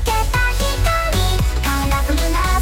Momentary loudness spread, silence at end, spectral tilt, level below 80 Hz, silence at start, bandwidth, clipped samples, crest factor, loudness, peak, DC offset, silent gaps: 1 LU; 0 s; -4 dB/octave; -18 dBFS; 0 s; 17 kHz; under 0.1%; 10 dB; -18 LUFS; -6 dBFS; under 0.1%; none